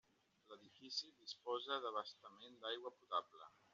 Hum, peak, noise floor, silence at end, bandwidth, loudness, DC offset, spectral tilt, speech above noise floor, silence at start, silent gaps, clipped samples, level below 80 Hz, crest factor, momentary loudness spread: none; -28 dBFS; -70 dBFS; 0.25 s; 7.4 kHz; -47 LUFS; under 0.1%; 1 dB/octave; 22 dB; 0.5 s; none; under 0.1%; under -90 dBFS; 22 dB; 19 LU